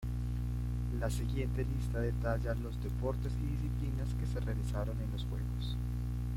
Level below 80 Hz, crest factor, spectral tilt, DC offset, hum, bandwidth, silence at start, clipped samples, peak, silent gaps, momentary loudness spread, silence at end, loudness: -38 dBFS; 14 dB; -7.5 dB/octave; under 0.1%; 60 Hz at -35 dBFS; 15.5 kHz; 0 s; under 0.1%; -20 dBFS; none; 3 LU; 0 s; -37 LUFS